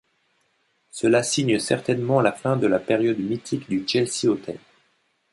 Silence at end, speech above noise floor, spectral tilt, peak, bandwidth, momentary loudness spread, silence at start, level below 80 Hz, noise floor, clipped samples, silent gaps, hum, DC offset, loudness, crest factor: 0.75 s; 46 dB; -5 dB/octave; -6 dBFS; 11.5 kHz; 8 LU; 0.95 s; -62 dBFS; -68 dBFS; under 0.1%; none; none; under 0.1%; -22 LUFS; 18 dB